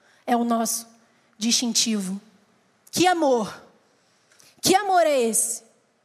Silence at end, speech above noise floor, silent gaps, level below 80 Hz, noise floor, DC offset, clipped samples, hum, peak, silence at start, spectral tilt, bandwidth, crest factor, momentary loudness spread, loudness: 0.45 s; 41 dB; none; -72 dBFS; -62 dBFS; under 0.1%; under 0.1%; none; -6 dBFS; 0.25 s; -2.5 dB/octave; 15.5 kHz; 18 dB; 11 LU; -22 LUFS